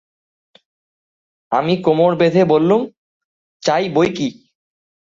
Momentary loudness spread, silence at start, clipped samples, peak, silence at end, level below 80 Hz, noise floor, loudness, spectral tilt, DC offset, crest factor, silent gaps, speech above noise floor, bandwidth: 10 LU; 1.5 s; under 0.1%; -2 dBFS; 0.8 s; -58 dBFS; under -90 dBFS; -16 LUFS; -6.5 dB/octave; under 0.1%; 16 dB; 2.97-3.60 s; over 75 dB; 7.6 kHz